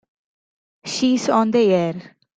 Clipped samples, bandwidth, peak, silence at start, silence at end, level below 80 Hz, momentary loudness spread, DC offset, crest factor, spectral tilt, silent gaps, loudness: under 0.1%; 9.2 kHz; -6 dBFS; 0.85 s; 0.35 s; -64 dBFS; 16 LU; under 0.1%; 16 dB; -5 dB/octave; none; -19 LUFS